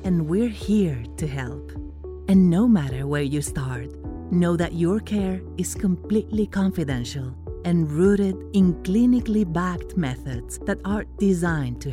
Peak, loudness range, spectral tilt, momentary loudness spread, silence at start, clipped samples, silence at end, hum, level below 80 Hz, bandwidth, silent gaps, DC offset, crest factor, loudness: -8 dBFS; 3 LU; -7 dB/octave; 13 LU; 0 s; under 0.1%; 0 s; none; -38 dBFS; 14.5 kHz; none; under 0.1%; 14 dB; -23 LUFS